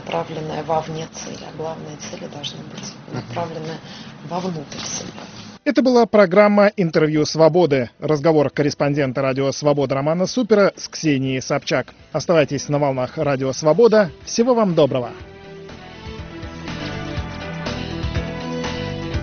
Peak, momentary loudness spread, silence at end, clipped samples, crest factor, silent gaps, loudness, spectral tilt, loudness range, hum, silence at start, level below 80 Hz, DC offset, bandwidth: 0 dBFS; 19 LU; 0 s; under 0.1%; 20 dB; none; -19 LUFS; -5 dB/octave; 13 LU; none; 0 s; -44 dBFS; under 0.1%; 6.8 kHz